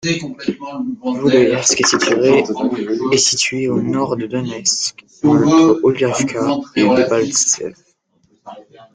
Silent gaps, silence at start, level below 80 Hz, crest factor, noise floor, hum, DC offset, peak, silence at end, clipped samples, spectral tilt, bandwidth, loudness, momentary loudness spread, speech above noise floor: none; 0.05 s; -54 dBFS; 16 dB; -59 dBFS; none; under 0.1%; 0 dBFS; 0.35 s; under 0.1%; -3.5 dB/octave; 10 kHz; -15 LUFS; 10 LU; 44 dB